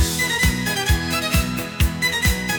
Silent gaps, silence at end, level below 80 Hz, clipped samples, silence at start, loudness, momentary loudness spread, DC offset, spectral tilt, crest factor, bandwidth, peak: none; 0 s; -26 dBFS; under 0.1%; 0 s; -20 LUFS; 4 LU; under 0.1%; -3.5 dB/octave; 18 dB; 19.5 kHz; -4 dBFS